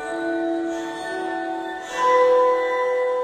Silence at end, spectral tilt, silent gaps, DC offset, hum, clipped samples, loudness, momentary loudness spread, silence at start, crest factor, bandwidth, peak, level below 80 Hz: 0 s; -3.5 dB/octave; none; under 0.1%; none; under 0.1%; -22 LUFS; 12 LU; 0 s; 14 dB; 9.8 kHz; -6 dBFS; -64 dBFS